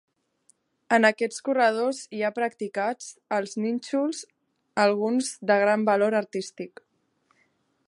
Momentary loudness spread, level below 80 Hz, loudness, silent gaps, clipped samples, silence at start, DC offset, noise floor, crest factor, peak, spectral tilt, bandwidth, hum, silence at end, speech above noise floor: 12 LU; -82 dBFS; -25 LUFS; none; under 0.1%; 0.9 s; under 0.1%; -69 dBFS; 20 dB; -6 dBFS; -4 dB/octave; 11.5 kHz; none; 1.2 s; 45 dB